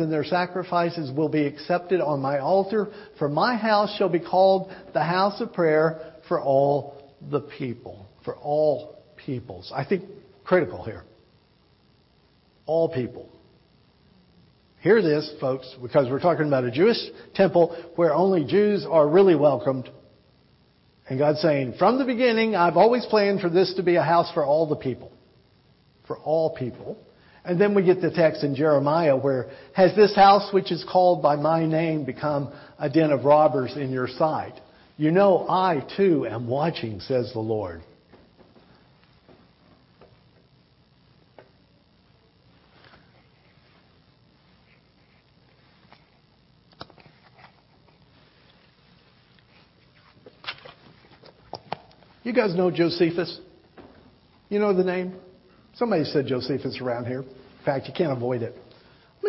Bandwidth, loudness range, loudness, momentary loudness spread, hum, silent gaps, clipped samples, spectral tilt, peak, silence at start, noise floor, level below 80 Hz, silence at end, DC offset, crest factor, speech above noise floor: 6 kHz; 10 LU; -23 LUFS; 17 LU; none; none; under 0.1%; -10 dB/octave; -6 dBFS; 0 s; -60 dBFS; -64 dBFS; 0 s; under 0.1%; 18 dB; 38 dB